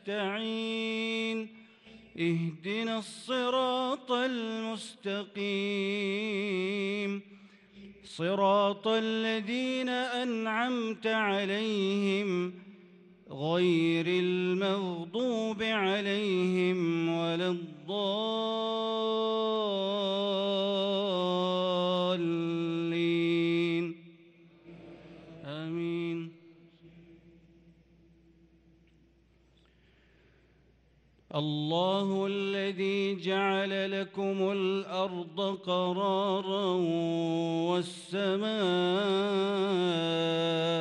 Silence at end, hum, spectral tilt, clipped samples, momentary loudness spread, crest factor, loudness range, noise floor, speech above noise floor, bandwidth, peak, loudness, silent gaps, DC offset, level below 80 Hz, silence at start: 0 s; none; -6 dB/octave; under 0.1%; 8 LU; 16 dB; 6 LU; -65 dBFS; 34 dB; 11 kHz; -16 dBFS; -31 LUFS; none; under 0.1%; -74 dBFS; 0.05 s